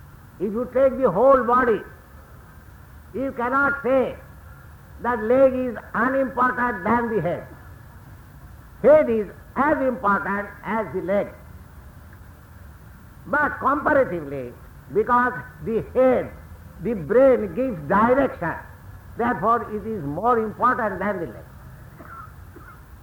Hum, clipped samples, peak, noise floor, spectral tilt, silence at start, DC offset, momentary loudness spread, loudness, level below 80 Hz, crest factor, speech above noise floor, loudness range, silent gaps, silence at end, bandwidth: none; under 0.1%; -6 dBFS; -45 dBFS; -8 dB/octave; 0 s; under 0.1%; 17 LU; -21 LUFS; -46 dBFS; 18 dB; 24 dB; 5 LU; none; 0 s; 19.5 kHz